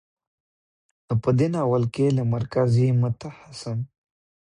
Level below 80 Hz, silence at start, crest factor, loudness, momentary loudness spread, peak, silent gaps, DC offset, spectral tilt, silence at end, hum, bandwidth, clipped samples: -54 dBFS; 1.1 s; 16 dB; -23 LUFS; 14 LU; -10 dBFS; none; under 0.1%; -8.5 dB/octave; 0.65 s; none; 10.5 kHz; under 0.1%